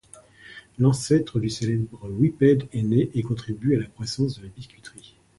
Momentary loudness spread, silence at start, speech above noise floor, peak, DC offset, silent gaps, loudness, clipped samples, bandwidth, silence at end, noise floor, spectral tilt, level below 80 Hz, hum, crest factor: 23 LU; 0.5 s; 26 dB; -6 dBFS; under 0.1%; none; -24 LUFS; under 0.1%; 11.5 kHz; 0.5 s; -49 dBFS; -7 dB/octave; -52 dBFS; none; 18 dB